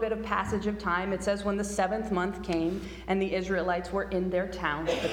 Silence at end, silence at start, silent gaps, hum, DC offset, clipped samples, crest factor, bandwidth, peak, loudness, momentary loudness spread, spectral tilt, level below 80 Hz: 0 s; 0 s; none; none; under 0.1%; under 0.1%; 18 dB; 16.5 kHz; -12 dBFS; -30 LUFS; 2 LU; -5.5 dB/octave; -46 dBFS